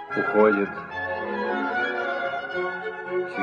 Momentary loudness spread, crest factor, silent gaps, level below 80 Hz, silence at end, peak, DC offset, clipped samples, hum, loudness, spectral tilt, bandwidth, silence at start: 10 LU; 20 dB; none; -66 dBFS; 0 s; -6 dBFS; under 0.1%; under 0.1%; none; -25 LUFS; -7 dB/octave; 7 kHz; 0 s